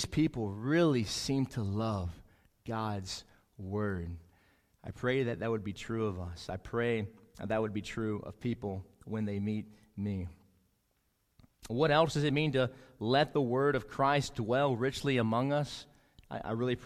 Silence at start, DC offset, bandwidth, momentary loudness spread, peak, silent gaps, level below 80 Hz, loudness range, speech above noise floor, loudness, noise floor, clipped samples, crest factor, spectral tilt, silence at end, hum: 0 s; under 0.1%; 15 kHz; 14 LU; -12 dBFS; none; -54 dBFS; 8 LU; 44 dB; -33 LUFS; -76 dBFS; under 0.1%; 20 dB; -6 dB/octave; 0 s; none